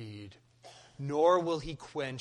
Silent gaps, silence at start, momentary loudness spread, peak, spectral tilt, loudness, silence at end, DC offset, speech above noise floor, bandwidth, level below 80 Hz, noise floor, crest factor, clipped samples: none; 0 s; 21 LU; -14 dBFS; -6 dB/octave; -31 LUFS; 0 s; under 0.1%; 26 dB; 10.5 kHz; -60 dBFS; -56 dBFS; 18 dB; under 0.1%